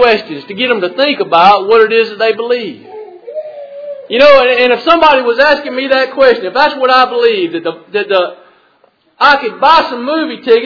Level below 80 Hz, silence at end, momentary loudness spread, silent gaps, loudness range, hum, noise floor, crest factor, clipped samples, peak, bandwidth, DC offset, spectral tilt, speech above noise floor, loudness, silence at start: -48 dBFS; 0 s; 18 LU; none; 3 LU; none; -52 dBFS; 10 dB; 1%; 0 dBFS; 5.4 kHz; under 0.1%; -4.5 dB/octave; 42 dB; -10 LUFS; 0 s